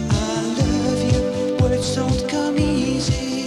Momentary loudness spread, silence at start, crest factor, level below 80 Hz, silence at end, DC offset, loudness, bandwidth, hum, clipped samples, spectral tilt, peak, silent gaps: 2 LU; 0 s; 14 dB; -32 dBFS; 0 s; under 0.1%; -20 LUFS; 13 kHz; none; under 0.1%; -5.5 dB/octave; -4 dBFS; none